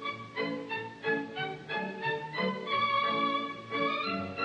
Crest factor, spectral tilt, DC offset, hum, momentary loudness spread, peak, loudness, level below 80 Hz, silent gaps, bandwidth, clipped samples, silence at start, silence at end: 16 dB; -5.5 dB/octave; under 0.1%; none; 8 LU; -18 dBFS; -32 LUFS; -76 dBFS; none; 9 kHz; under 0.1%; 0 s; 0 s